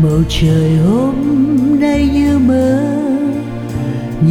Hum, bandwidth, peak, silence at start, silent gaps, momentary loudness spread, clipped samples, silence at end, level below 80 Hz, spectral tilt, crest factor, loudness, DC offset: none; 13.5 kHz; -2 dBFS; 0 s; none; 8 LU; under 0.1%; 0 s; -28 dBFS; -7.5 dB/octave; 10 dB; -13 LUFS; under 0.1%